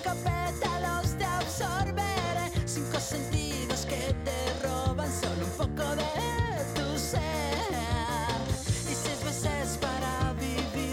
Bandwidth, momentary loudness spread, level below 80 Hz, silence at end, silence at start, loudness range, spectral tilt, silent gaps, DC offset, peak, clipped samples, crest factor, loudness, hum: 16.5 kHz; 2 LU; -40 dBFS; 0 s; 0 s; 1 LU; -4.5 dB/octave; none; under 0.1%; -16 dBFS; under 0.1%; 14 dB; -31 LUFS; none